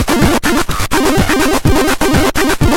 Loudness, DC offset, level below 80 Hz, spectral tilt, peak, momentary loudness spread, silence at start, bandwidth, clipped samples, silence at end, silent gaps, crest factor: -12 LUFS; under 0.1%; -22 dBFS; -4.5 dB/octave; 0 dBFS; 2 LU; 0 s; 19 kHz; under 0.1%; 0 s; none; 10 dB